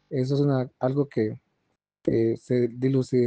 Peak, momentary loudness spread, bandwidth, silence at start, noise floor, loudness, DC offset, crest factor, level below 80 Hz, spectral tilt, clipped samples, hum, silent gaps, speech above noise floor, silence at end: -10 dBFS; 6 LU; 8.8 kHz; 0.1 s; -76 dBFS; -26 LUFS; under 0.1%; 14 dB; -60 dBFS; -9 dB/octave; under 0.1%; none; none; 52 dB; 0 s